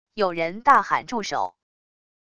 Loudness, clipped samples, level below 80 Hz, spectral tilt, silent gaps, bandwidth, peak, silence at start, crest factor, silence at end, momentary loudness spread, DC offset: -22 LUFS; under 0.1%; -62 dBFS; -4 dB/octave; none; 11 kHz; -2 dBFS; 0.15 s; 22 dB; 0.8 s; 10 LU; under 0.1%